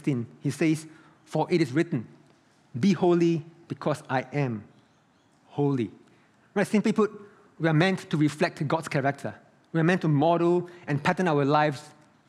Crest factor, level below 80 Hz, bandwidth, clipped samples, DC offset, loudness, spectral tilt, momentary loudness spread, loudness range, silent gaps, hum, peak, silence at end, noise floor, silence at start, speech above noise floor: 20 dB; -74 dBFS; 12.5 kHz; under 0.1%; under 0.1%; -26 LUFS; -7 dB/octave; 10 LU; 4 LU; none; none; -6 dBFS; 0.4 s; -63 dBFS; 0.05 s; 38 dB